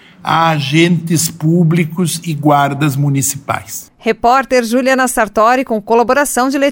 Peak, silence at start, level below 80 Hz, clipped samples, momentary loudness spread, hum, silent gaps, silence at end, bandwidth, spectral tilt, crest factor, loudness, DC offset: 0 dBFS; 0.25 s; -46 dBFS; under 0.1%; 6 LU; none; none; 0 s; 17 kHz; -5 dB/octave; 12 dB; -13 LUFS; under 0.1%